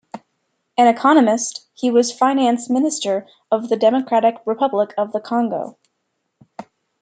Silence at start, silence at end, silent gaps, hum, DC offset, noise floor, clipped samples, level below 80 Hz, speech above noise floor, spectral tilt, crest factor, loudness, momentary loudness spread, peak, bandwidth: 0.15 s; 0.4 s; none; none; under 0.1%; -73 dBFS; under 0.1%; -72 dBFS; 56 dB; -4 dB/octave; 16 dB; -18 LUFS; 11 LU; -2 dBFS; 9.4 kHz